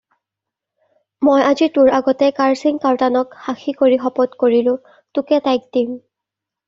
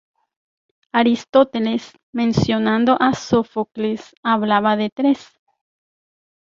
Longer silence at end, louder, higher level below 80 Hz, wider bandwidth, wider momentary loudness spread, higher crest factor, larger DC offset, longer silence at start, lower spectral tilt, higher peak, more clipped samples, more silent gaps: second, 0.7 s vs 1.25 s; first, -16 LUFS vs -19 LUFS; second, -60 dBFS vs -52 dBFS; about the same, 7.6 kHz vs 7.6 kHz; first, 11 LU vs 8 LU; about the same, 14 dB vs 18 dB; neither; first, 1.2 s vs 0.95 s; second, -3 dB/octave vs -6 dB/octave; about the same, -2 dBFS vs -2 dBFS; neither; second, none vs 2.03-2.13 s, 4.17-4.23 s, 4.92-4.96 s